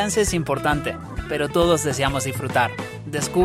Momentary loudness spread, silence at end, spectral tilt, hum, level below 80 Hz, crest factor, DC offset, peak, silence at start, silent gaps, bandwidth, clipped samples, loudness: 10 LU; 0 s; -4.5 dB/octave; none; -38 dBFS; 18 dB; under 0.1%; -4 dBFS; 0 s; none; 16 kHz; under 0.1%; -22 LUFS